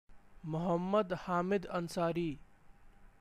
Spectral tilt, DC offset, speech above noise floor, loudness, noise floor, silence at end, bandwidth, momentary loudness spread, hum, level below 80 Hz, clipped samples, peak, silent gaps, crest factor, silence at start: -7 dB/octave; under 0.1%; 24 dB; -35 LUFS; -58 dBFS; 0.15 s; 14.5 kHz; 9 LU; none; -60 dBFS; under 0.1%; -20 dBFS; none; 16 dB; 0.1 s